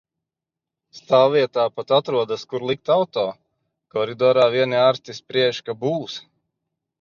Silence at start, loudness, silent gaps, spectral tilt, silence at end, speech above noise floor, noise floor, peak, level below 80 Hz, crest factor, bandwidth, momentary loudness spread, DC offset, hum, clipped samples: 0.95 s; -20 LUFS; none; -5.5 dB/octave; 0.8 s; 67 dB; -87 dBFS; -4 dBFS; -70 dBFS; 18 dB; 7.2 kHz; 11 LU; under 0.1%; none; under 0.1%